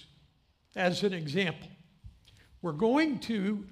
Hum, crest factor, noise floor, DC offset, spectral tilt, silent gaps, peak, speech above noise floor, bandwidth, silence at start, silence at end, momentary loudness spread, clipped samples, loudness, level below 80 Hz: none; 18 dB; -67 dBFS; under 0.1%; -6 dB/octave; none; -14 dBFS; 37 dB; 13.5 kHz; 0.75 s; 0 s; 13 LU; under 0.1%; -30 LUFS; -64 dBFS